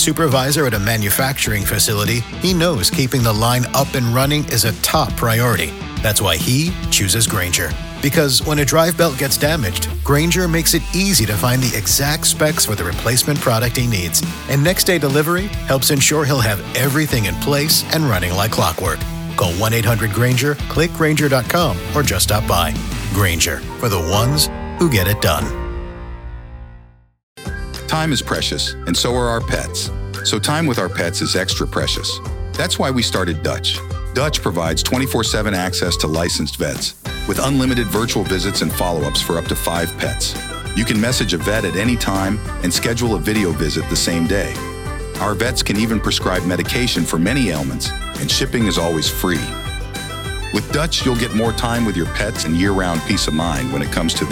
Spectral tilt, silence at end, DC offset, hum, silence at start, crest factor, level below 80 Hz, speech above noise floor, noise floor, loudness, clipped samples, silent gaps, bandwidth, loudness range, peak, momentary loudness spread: -4 dB/octave; 0 s; under 0.1%; none; 0 s; 18 dB; -30 dBFS; 26 dB; -43 dBFS; -17 LUFS; under 0.1%; 27.23-27.36 s; 19.5 kHz; 4 LU; 0 dBFS; 8 LU